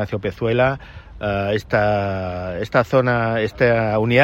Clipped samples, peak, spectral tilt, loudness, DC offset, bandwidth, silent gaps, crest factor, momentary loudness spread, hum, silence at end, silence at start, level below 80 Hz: under 0.1%; 0 dBFS; -7.5 dB/octave; -20 LUFS; under 0.1%; 12.5 kHz; none; 18 dB; 9 LU; none; 0 s; 0 s; -42 dBFS